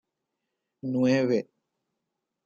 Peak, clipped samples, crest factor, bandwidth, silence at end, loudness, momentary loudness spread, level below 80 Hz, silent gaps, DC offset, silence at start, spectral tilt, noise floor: -14 dBFS; under 0.1%; 16 dB; 7.2 kHz; 1.05 s; -26 LUFS; 16 LU; -74 dBFS; none; under 0.1%; 0.85 s; -7 dB/octave; -84 dBFS